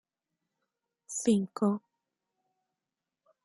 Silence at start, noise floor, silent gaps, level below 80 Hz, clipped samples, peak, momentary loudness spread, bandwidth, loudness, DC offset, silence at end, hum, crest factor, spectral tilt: 1.1 s; -89 dBFS; none; -78 dBFS; under 0.1%; -16 dBFS; 10 LU; 11.5 kHz; -31 LUFS; under 0.1%; 1.65 s; none; 20 dB; -5.5 dB/octave